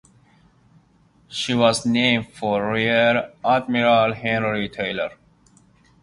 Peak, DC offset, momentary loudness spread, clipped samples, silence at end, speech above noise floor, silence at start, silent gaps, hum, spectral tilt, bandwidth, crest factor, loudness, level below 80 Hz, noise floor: -2 dBFS; under 0.1%; 8 LU; under 0.1%; 0.9 s; 37 dB; 1.3 s; none; none; -4.5 dB/octave; 11.5 kHz; 20 dB; -20 LUFS; -56 dBFS; -57 dBFS